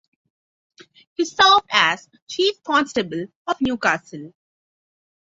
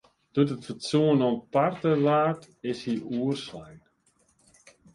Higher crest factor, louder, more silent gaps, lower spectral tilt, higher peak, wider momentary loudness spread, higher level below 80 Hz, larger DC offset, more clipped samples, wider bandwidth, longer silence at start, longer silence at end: about the same, 22 dB vs 18 dB; first, -19 LUFS vs -26 LUFS; first, 2.22-2.27 s, 3.35-3.45 s vs none; second, -2.5 dB/octave vs -7 dB/octave; first, -2 dBFS vs -10 dBFS; first, 17 LU vs 12 LU; first, -58 dBFS vs -66 dBFS; neither; neither; second, 8 kHz vs 11.5 kHz; first, 1.2 s vs 0.35 s; second, 0.95 s vs 1.2 s